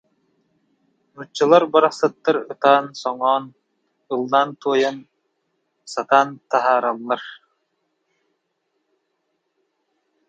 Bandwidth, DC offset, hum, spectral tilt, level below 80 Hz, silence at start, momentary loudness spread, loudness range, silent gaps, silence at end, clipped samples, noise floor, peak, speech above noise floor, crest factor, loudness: 9.2 kHz; under 0.1%; none; -4.5 dB/octave; -76 dBFS; 1.2 s; 13 LU; 6 LU; none; 2.95 s; under 0.1%; -73 dBFS; 0 dBFS; 54 dB; 22 dB; -19 LUFS